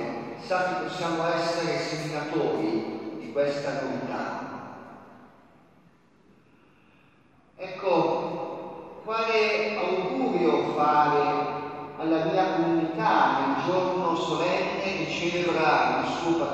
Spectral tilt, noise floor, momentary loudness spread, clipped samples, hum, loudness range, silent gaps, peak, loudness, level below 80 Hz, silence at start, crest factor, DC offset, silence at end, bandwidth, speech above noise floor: -5.5 dB/octave; -59 dBFS; 14 LU; under 0.1%; none; 9 LU; none; -10 dBFS; -26 LUFS; -68 dBFS; 0 s; 18 dB; under 0.1%; 0 s; 9 kHz; 34 dB